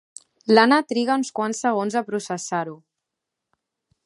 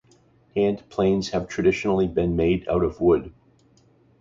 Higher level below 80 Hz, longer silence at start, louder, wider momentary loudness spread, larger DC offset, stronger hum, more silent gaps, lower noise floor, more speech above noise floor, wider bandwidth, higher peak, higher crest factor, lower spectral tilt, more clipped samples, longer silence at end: second, -76 dBFS vs -42 dBFS; about the same, 0.45 s vs 0.55 s; about the same, -21 LUFS vs -23 LUFS; first, 12 LU vs 4 LU; neither; neither; neither; first, -83 dBFS vs -58 dBFS; first, 63 dB vs 36 dB; first, 11.5 kHz vs 7.6 kHz; first, 0 dBFS vs -8 dBFS; first, 22 dB vs 16 dB; second, -4 dB/octave vs -7 dB/octave; neither; first, 1.3 s vs 0.9 s